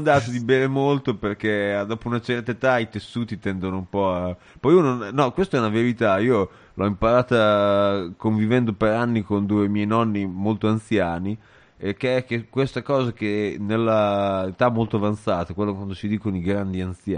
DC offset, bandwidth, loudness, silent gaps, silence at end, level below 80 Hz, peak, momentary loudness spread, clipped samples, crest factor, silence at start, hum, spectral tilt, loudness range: under 0.1%; 10 kHz; -22 LUFS; none; 0 s; -50 dBFS; -4 dBFS; 9 LU; under 0.1%; 18 dB; 0 s; none; -7.5 dB/octave; 4 LU